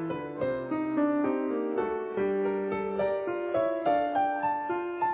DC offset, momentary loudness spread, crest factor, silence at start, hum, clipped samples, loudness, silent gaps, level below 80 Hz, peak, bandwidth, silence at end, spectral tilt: under 0.1%; 5 LU; 12 dB; 0 s; none; under 0.1%; -29 LUFS; none; -64 dBFS; -16 dBFS; 4 kHz; 0 s; -5.5 dB/octave